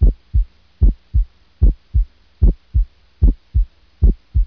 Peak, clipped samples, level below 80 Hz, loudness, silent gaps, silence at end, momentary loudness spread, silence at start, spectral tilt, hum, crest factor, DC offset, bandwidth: -2 dBFS; under 0.1%; -16 dBFS; -21 LUFS; none; 0 s; 11 LU; 0 s; -12 dB/octave; none; 14 dB; under 0.1%; 0.9 kHz